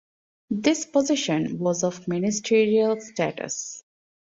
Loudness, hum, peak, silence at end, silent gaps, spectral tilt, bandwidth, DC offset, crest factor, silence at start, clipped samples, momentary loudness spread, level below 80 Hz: -24 LUFS; none; -8 dBFS; 0.55 s; none; -4.5 dB/octave; 7.8 kHz; under 0.1%; 16 dB; 0.5 s; under 0.1%; 10 LU; -66 dBFS